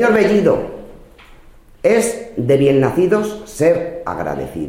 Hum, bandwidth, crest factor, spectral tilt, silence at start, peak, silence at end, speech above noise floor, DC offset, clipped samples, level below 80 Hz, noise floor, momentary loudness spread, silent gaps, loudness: none; 16 kHz; 16 dB; -6 dB/octave; 0 s; 0 dBFS; 0 s; 27 dB; under 0.1%; under 0.1%; -42 dBFS; -43 dBFS; 11 LU; none; -16 LUFS